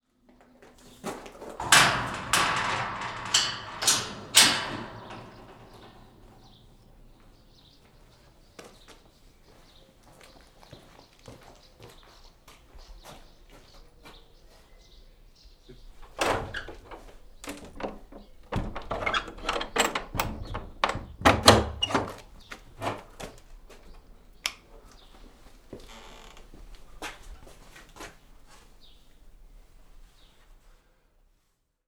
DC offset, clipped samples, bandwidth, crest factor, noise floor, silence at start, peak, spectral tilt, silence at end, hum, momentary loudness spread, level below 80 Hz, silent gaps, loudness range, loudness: under 0.1%; under 0.1%; over 20 kHz; 32 dB; -73 dBFS; 0.85 s; 0 dBFS; -2 dB/octave; 1.8 s; none; 30 LU; -48 dBFS; none; 23 LU; -25 LUFS